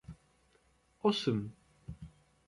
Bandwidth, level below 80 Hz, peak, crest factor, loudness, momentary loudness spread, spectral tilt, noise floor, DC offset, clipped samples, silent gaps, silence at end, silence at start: 11.5 kHz; -62 dBFS; -18 dBFS; 22 dB; -34 LUFS; 23 LU; -6 dB/octave; -70 dBFS; under 0.1%; under 0.1%; none; 0.4 s; 0.1 s